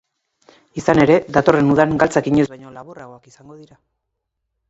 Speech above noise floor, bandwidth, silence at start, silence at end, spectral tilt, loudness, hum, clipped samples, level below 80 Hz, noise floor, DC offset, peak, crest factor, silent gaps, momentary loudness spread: 60 dB; 8 kHz; 0.75 s; 1.65 s; -7 dB/octave; -16 LUFS; none; under 0.1%; -48 dBFS; -76 dBFS; under 0.1%; 0 dBFS; 18 dB; none; 23 LU